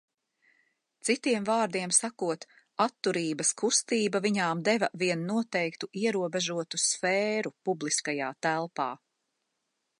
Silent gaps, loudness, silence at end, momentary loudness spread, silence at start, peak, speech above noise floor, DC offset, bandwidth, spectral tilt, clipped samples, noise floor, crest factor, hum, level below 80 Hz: none; -29 LUFS; 1.05 s; 8 LU; 1.05 s; -10 dBFS; 52 dB; under 0.1%; 11.5 kHz; -3 dB/octave; under 0.1%; -81 dBFS; 20 dB; none; -80 dBFS